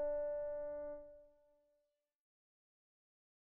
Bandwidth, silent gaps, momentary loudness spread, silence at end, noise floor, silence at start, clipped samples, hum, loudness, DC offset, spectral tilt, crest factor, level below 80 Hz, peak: 2.2 kHz; none; 19 LU; 2.25 s; -85 dBFS; 0 s; under 0.1%; none; -44 LUFS; under 0.1%; -1 dB/octave; 14 dB; -66 dBFS; -32 dBFS